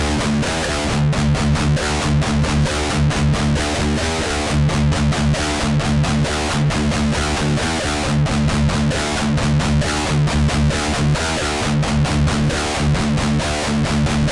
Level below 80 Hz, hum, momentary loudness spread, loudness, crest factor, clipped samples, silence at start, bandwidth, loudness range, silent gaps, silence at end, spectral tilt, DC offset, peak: -26 dBFS; none; 2 LU; -18 LUFS; 10 dB; under 0.1%; 0 s; 11.5 kHz; 1 LU; none; 0 s; -5 dB/octave; under 0.1%; -8 dBFS